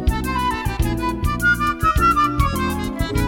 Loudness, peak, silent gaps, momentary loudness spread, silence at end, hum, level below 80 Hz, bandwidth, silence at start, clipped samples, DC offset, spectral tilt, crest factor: -19 LUFS; -4 dBFS; none; 7 LU; 0 s; none; -26 dBFS; 18 kHz; 0 s; under 0.1%; under 0.1%; -5.5 dB/octave; 16 dB